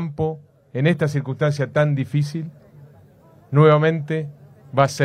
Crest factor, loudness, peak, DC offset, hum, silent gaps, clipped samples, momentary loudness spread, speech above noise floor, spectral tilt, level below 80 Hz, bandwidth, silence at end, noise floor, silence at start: 18 dB; -20 LUFS; -2 dBFS; under 0.1%; none; none; under 0.1%; 17 LU; 31 dB; -7 dB/octave; -58 dBFS; 10 kHz; 0 s; -50 dBFS; 0 s